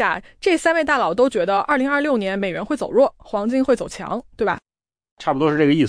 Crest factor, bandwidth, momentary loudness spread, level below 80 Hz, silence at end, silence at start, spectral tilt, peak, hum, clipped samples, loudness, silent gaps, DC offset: 14 dB; 10.5 kHz; 8 LU; -52 dBFS; 0 s; 0 s; -5.5 dB/octave; -6 dBFS; none; under 0.1%; -20 LUFS; 5.11-5.17 s; under 0.1%